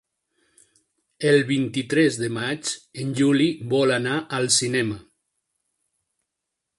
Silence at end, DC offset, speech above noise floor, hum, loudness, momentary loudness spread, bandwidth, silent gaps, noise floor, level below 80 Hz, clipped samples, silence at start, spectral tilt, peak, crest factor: 1.75 s; under 0.1%; 60 dB; none; -22 LUFS; 10 LU; 11.5 kHz; none; -82 dBFS; -62 dBFS; under 0.1%; 1.2 s; -4 dB/octave; -6 dBFS; 18 dB